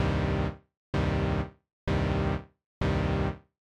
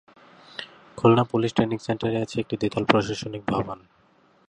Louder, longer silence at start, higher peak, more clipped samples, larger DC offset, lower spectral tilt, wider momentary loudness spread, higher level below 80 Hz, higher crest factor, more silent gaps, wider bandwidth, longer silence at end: second, -30 LUFS vs -24 LUFS; second, 0 s vs 0.6 s; second, -16 dBFS vs 0 dBFS; neither; neither; about the same, -7.5 dB/octave vs -6.5 dB/octave; second, 11 LU vs 19 LU; first, -38 dBFS vs -56 dBFS; second, 14 dB vs 24 dB; first, 0.77-0.93 s, 1.73-1.87 s, 2.66-2.81 s vs none; about the same, 9.2 kHz vs 10 kHz; second, 0.35 s vs 0.7 s